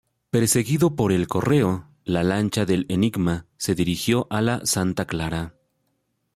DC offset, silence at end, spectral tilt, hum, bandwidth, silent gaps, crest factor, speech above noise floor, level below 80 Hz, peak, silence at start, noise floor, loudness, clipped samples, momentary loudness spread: under 0.1%; 0.85 s; -5 dB/octave; none; 16 kHz; none; 16 dB; 51 dB; -50 dBFS; -8 dBFS; 0.35 s; -72 dBFS; -22 LUFS; under 0.1%; 7 LU